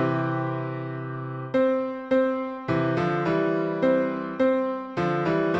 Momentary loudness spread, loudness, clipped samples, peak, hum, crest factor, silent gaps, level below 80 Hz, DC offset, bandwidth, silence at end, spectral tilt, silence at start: 8 LU; -25 LUFS; under 0.1%; -10 dBFS; none; 14 dB; none; -60 dBFS; under 0.1%; 7.4 kHz; 0 s; -8.5 dB/octave; 0 s